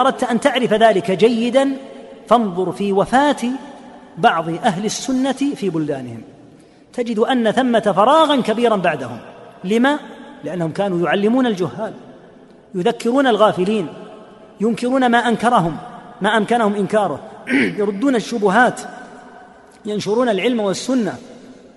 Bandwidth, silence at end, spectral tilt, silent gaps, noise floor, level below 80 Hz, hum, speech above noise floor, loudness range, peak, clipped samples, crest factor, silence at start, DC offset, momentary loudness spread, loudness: 11.5 kHz; 0.25 s; -5 dB/octave; none; -45 dBFS; -56 dBFS; none; 29 dB; 4 LU; 0 dBFS; under 0.1%; 16 dB; 0 s; under 0.1%; 17 LU; -17 LUFS